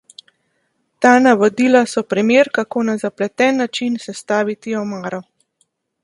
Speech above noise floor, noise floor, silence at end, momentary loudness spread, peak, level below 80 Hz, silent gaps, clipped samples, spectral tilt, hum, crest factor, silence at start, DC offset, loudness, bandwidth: 51 dB; -67 dBFS; 0.8 s; 12 LU; 0 dBFS; -66 dBFS; none; under 0.1%; -4.5 dB/octave; none; 18 dB; 1 s; under 0.1%; -16 LUFS; 11.5 kHz